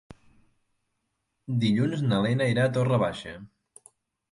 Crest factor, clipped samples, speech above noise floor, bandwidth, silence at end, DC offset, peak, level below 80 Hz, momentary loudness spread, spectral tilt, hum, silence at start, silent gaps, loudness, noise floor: 16 dB; under 0.1%; 54 dB; 11.5 kHz; 0.85 s; under 0.1%; -12 dBFS; -60 dBFS; 17 LU; -7 dB/octave; none; 1.5 s; none; -25 LUFS; -79 dBFS